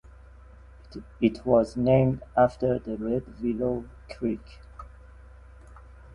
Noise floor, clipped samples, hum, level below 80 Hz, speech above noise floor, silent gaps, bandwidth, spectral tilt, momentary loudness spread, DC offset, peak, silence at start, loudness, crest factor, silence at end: -49 dBFS; under 0.1%; none; -48 dBFS; 23 dB; none; 10.5 kHz; -9 dB/octave; 23 LU; under 0.1%; -8 dBFS; 0.9 s; -26 LUFS; 20 dB; 0.25 s